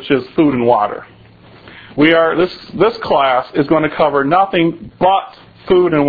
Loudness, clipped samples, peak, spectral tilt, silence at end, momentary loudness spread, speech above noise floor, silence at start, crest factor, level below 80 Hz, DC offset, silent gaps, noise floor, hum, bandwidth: -14 LUFS; under 0.1%; 0 dBFS; -8.5 dB/octave; 0 s; 7 LU; 28 dB; 0 s; 14 dB; -46 dBFS; under 0.1%; none; -42 dBFS; none; 5 kHz